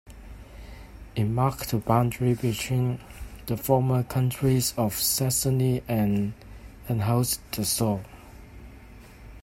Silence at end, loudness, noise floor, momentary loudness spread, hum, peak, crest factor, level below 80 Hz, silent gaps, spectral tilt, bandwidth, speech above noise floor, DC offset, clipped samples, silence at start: 0 s; -26 LUFS; -47 dBFS; 22 LU; none; -6 dBFS; 20 dB; -46 dBFS; none; -5.5 dB/octave; 16.5 kHz; 22 dB; under 0.1%; under 0.1%; 0.05 s